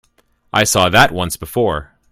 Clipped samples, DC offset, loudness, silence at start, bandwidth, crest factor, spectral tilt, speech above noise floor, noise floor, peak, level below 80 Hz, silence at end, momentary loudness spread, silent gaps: under 0.1%; under 0.1%; -14 LUFS; 0.55 s; 17 kHz; 16 dB; -3.5 dB/octave; 44 dB; -59 dBFS; 0 dBFS; -38 dBFS; 0.25 s; 10 LU; none